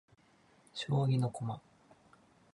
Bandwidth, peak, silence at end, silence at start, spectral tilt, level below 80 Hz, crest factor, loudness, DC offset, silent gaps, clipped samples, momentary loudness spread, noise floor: 11 kHz; -22 dBFS; 0.95 s; 0.75 s; -7 dB/octave; -72 dBFS; 16 dB; -35 LUFS; under 0.1%; none; under 0.1%; 16 LU; -67 dBFS